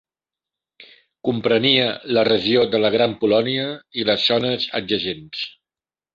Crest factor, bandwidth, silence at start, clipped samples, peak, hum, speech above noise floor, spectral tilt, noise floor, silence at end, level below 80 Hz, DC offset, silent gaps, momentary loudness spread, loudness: 20 dB; 7.4 kHz; 0.8 s; under 0.1%; -2 dBFS; none; over 71 dB; -6.5 dB/octave; under -90 dBFS; 0.65 s; -58 dBFS; under 0.1%; none; 11 LU; -19 LUFS